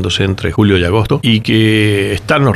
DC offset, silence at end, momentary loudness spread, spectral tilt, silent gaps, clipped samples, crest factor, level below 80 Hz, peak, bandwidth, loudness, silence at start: under 0.1%; 0 s; 4 LU; -6 dB/octave; none; under 0.1%; 12 dB; -34 dBFS; 0 dBFS; 13 kHz; -12 LUFS; 0 s